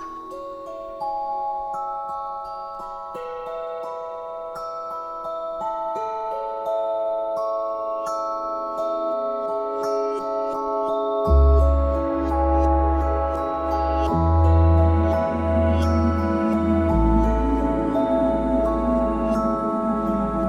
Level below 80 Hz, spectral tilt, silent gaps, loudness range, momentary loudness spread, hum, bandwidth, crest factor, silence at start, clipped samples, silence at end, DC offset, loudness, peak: -28 dBFS; -9 dB/octave; none; 10 LU; 13 LU; none; 7.2 kHz; 16 dB; 0 s; under 0.1%; 0 s; under 0.1%; -23 LUFS; -6 dBFS